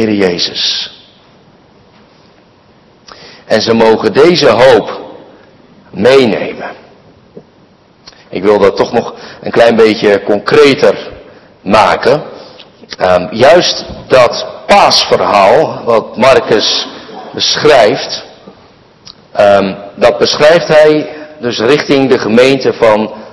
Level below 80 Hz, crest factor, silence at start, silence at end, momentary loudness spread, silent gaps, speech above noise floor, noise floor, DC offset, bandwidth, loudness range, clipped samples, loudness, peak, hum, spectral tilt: -44 dBFS; 10 dB; 0 s; 0.05 s; 15 LU; none; 36 dB; -44 dBFS; under 0.1%; 12 kHz; 7 LU; 4%; -8 LUFS; 0 dBFS; none; -4.5 dB/octave